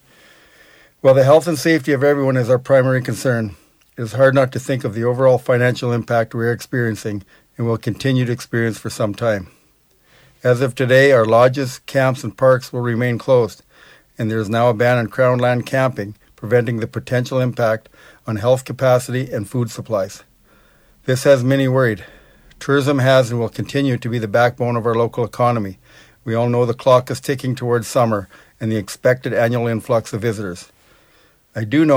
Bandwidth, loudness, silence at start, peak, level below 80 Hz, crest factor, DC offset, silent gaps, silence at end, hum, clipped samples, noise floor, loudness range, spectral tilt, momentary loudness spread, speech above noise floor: 16 kHz; -17 LUFS; 1.05 s; -2 dBFS; -54 dBFS; 16 dB; under 0.1%; none; 0 s; none; under 0.1%; -57 dBFS; 5 LU; -6.5 dB/octave; 11 LU; 40 dB